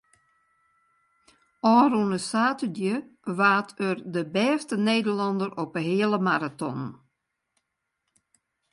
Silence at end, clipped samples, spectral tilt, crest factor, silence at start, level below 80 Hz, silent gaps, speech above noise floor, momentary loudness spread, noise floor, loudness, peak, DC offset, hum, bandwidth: 1.8 s; under 0.1%; -5.5 dB/octave; 18 dB; 1.65 s; -74 dBFS; none; 55 dB; 11 LU; -80 dBFS; -25 LUFS; -8 dBFS; under 0.1%; none; 11.5 kHz